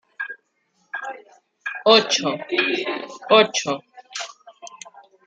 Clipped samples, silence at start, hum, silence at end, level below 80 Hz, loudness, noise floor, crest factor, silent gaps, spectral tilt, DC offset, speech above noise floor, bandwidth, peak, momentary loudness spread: under 0.1%; 0.2 s; none; 0.5 s; -78 dBFS; -20 LUFS; -67 dBFS; 22 dB; none; -2 dB/octave; under 0.1%; 49 dB; 9.2 kHz; -2 dBFS; 25 LU